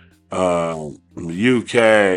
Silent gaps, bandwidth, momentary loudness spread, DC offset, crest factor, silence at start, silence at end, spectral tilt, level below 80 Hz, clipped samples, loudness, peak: none; 11 kHz; 17 LU; under 0.1%; 18 dB; 0.3 s; 0 s; -5 dB/octave; -54 dBFS; under 0.1%; -17 LUFS; 0 dBFS